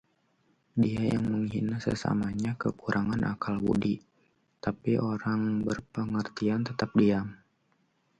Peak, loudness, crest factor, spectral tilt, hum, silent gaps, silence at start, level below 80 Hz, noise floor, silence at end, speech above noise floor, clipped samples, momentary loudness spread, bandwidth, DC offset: -12 dBFS; -30 LUFS; 18 dB; -7.5 dB/octave; none; none; 0.75 s; -56 dBFS; -71 dBFS; 0.85 s; 43 dB; under 0.1%; 6 LU; 9.2 kHz; under 0.1%